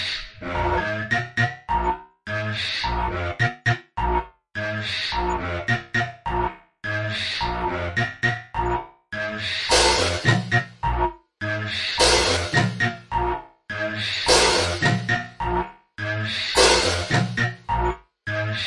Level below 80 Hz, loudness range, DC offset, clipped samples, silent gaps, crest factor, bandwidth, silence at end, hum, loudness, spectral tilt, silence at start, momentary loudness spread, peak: -36 dBFS; 5 LU; under 0.1%; under 0.1%; none; 20 dB; 11.5 kHz; 0 s; none; -23 LUFS; -3.5 dB/octave; 0 s; 12 LU; -4 dBFS